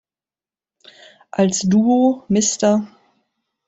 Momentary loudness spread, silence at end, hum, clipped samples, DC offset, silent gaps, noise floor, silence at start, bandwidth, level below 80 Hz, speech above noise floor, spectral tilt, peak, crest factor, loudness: 8 LU; 0.8 s; none; under 0.1%; under 0.1%; none; under -90 dBFS; 1.35 s; 8.4 kHz; -58 dBFS; over 74 dB; -5 dB/octave; -4 dBFS; 16 dB; -17 LUFS